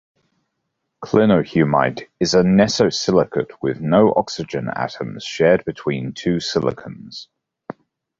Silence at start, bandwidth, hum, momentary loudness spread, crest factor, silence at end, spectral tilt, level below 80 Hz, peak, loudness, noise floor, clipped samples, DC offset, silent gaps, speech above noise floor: 1 s; 7.8 kHz; none; 19 LU; 18 dB; 0.95 s; -5.5 dB/octave; -50 dBFS; 0 dBFS; -18 LUFS; -75 dBFS; under 0.1%; under 0.1%; none; 57 dB